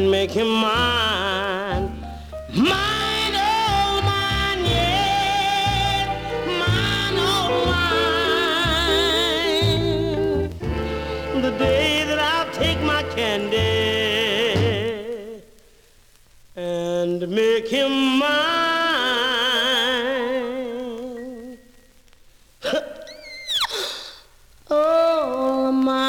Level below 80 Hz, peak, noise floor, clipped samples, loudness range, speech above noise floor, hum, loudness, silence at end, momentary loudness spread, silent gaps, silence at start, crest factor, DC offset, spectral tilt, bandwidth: -38 dBFS; -6 dBFS; -52 dBFS; under 0.1%; 6 LU; 33 dB; none; -20 LUFS; 0 s; 11 LU; none; 0 s; 14 dB; under 0.1%; -4.5 dB/octave; 19 kHz